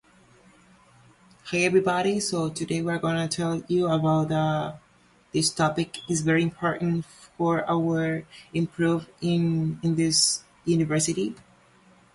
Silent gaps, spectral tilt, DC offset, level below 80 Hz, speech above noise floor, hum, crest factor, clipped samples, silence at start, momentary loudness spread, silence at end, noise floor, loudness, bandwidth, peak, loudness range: none; -4.5 dB/octave; under 0.1%; -60 dBFS; 34 dB; none; 16 dB; under 0.1%; 1.45 s; 8 LU; 0.75 s; -59 dBFS; -25 LUFS; 11.5 kHz; -10 dBFS; 2 LU